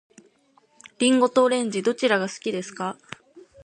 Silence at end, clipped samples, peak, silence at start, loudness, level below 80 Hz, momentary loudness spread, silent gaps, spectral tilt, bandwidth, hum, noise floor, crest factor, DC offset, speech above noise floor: 0.25 s; under 0.1%; -8 dBFS; 1 s; -23 LUFS; -70 dBFS; 18 LU; none; -3.5 dB/octave; 10.5 kHz; none; -61 dBFS; 18 dB; under 0.1%; 39 dB